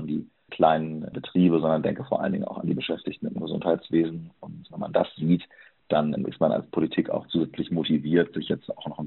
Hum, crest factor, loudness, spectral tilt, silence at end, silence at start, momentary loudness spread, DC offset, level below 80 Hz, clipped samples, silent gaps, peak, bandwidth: none; 18 dB; -26 LUFS; -6 dB/octave; 0 s; 0 s; 11 LU; under 0.1%; -60 dBFS; under 0.1%; none; -6 dBFS; 4.2 kHz